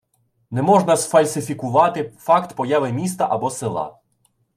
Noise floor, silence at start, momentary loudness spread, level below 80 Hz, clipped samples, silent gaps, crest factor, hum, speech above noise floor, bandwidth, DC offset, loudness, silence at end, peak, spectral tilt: -65 dBFS; 0.5 s; 11 LU; -64 dBFS; under 0.1%; none; 18 dB; none; 46 dB; 15.5 kHz; under 0.1%; -19 LUFS; 0.65 s; -2 dBFS; -5.5 dB/octave